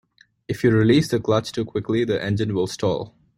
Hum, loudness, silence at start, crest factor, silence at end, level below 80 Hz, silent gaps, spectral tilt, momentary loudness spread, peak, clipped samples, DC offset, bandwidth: none; -21 LUFS; 0.5 s; 16 dB; 0.3 s; -52 dBFS; none; -6.5 dB/octave; 10 LU; -6 dBFS; under 0.1%; under 0.1%; 16 kHz